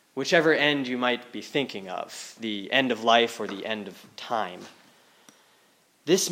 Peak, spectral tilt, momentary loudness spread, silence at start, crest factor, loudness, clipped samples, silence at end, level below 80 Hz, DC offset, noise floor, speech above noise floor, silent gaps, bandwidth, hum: -4 dBFS; -3 dB/octave; 15 LU; 0.15 s; 22 dB; -26 LUFS; under 0.1%; 0 s; -84 dBFS; under 0.1%; -63 dBFS; 36 dB; none; 16.5 kHz; none